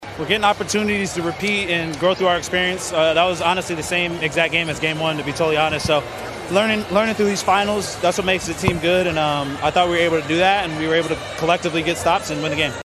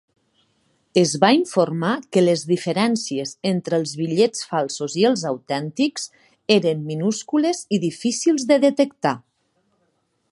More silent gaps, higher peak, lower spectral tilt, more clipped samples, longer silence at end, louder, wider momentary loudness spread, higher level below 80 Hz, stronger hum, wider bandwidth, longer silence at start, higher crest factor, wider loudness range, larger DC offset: neither; about the same, -2 dBFS vs -2 dBFS; about the same, -4 dB/octave vs -5 dB/octave; neither; second, 0 s vs 1.1 s; about the same, -19 LUFS vs -20 LUFS; second, 4 LU vs 8 LU; first, -44 dBFS vs -68 dBFS; neither; first, 13.5 kHz vs 11.5 kHz; second, 0 s vs 0.95 s; about the same, 18 dB vs 20 dB; about the same, 1 LU vs 2 LU; neither